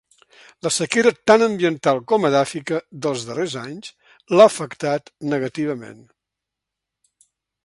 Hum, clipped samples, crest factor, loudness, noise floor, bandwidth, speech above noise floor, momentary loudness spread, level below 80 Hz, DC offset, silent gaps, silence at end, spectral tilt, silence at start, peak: none; under 0.1%; 20 dB; -19 LUFS; -84 dBFS; 11.5 kHz; 65 dB; 14 LU; -64 dBFS; under 0.1%; none; 1.7 s; -4.5 dB/octave; 0.65 s; 0 dBFS